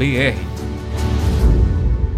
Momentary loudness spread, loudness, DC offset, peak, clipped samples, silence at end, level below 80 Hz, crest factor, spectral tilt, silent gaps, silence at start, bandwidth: 10 LU; -18 LUFS; under 0.1%; -4 dBFS; under 0.1%; 0 s; -18 dBFS; 12 dB; -6.5 dB/octave; none; 0 s; 14 kHz